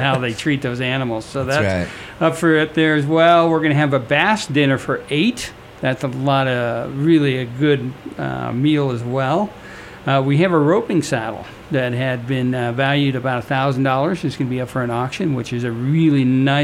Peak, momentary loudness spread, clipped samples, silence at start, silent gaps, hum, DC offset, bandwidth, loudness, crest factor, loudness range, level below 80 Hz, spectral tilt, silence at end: -2 dBFS; 9 LU; under 0.1%; 0 s; none; none; under 0.1%; 13.5 kHz; -18 LUFS; 16 dB; 4 LU; -50 dBFS; -6.5 dB/octave; 0 s